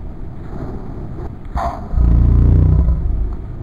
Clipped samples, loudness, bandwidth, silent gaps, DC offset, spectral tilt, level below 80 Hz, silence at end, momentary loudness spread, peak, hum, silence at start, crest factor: under 0.1%; -16 LUFS; 4.7 kHz; none; under 0.1%; -10.5 dB/octave; -18 dBFS; 0 s; 17 LU; -2 dBFS; none; 0 s; 14 dB